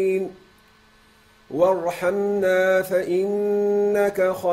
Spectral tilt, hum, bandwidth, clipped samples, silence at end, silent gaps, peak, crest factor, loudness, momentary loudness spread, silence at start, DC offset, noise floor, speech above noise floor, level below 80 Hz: -6 dB/octave; none; 16 kHz; under 0.1%; 0 s; none; -6 dBFS; 14 dB; -21 LUFS; 4 LU; 0 s; under 0.1%; -55 dBFS; 34 dB; -60 dBFS